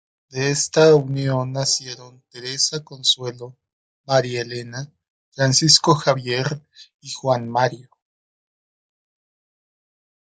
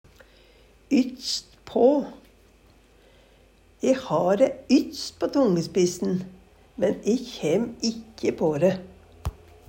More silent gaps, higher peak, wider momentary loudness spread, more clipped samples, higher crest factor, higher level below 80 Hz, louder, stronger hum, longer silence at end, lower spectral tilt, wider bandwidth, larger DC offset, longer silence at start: first, 3.73-4.04 s, 5.10-5.32 s, 6.94-6.99 s vs none; first, 0 dBFS vs -8 dBFS; first, 20 LU vs 14 LU; neither; about the same, 22 dB vs 18 dB; second, -64 dBFS vs -52 dBFS; first, -19 LUFS vs -24 LUFS; neither; first, 2.45 s vs 0.35 s; second, -3.5 dB/octave vs -5.5 dB/octave; second, 10 kHz vs 16 kHz; neither; second, 0.35 s vs 0.9 s